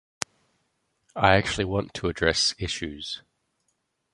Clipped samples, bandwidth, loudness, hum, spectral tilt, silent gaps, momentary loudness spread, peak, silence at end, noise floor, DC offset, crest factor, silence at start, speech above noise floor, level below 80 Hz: under 0.1%; 11.5 kHz; -25 LUFS; none; -3.5 dB/octave; none; 15 LU; -2 dBFS; 0.95 s; -75 dBFS; under 0.1%; 26 dB; 1.15 s; 50 dB; -46 dBFS